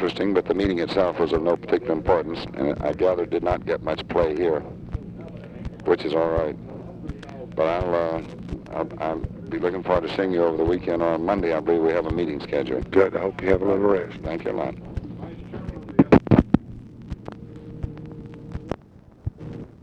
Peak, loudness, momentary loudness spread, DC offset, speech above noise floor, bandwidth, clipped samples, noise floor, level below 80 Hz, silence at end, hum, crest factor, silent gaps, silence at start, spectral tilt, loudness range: 0 dBFS; -23 LUFS; 16 LU; under 0.1%; 26 dB; 8.6 kHz; under 0.1%; -49 dBFS; -40 dBFS; 0.1 s; none; 24 dB; none; 0 s; -8.5 dB/octave; 4 LU